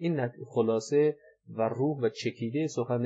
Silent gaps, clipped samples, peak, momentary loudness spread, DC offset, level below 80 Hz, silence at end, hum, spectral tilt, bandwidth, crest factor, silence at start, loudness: none; under 0.1%; -16 dBFS; 7 LU; under 0.1%; -82 dBFS; 0 s; none; -6.5 dB/octave; 8 kHz; 14 dB; 0 s; -30 LUFS